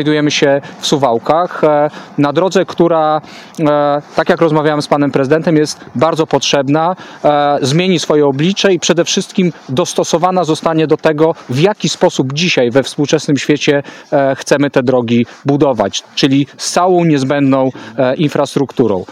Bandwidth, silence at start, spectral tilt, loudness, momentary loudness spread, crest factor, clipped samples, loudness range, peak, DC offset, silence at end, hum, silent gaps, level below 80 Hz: 14 kHz; 0 s; -5 dB/octave; -13 LUFS; 4 LU; 12 dB; under 0.1%; 1 LU; 0 dBFS; under 0.1%; 0 s; none; none; -54 dBFS